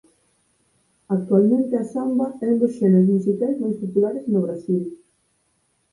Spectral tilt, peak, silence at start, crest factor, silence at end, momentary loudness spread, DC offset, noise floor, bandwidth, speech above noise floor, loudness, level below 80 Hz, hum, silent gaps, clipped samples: -11 dB/octave; -6 dBFS; 1.1 s; 16 dB; 1 s; 8 LU; under 0.1%; -67 dBFS; 11 kHz; 48 dB; -21 LUFS; -66 dBFS; none; none; under 0.1%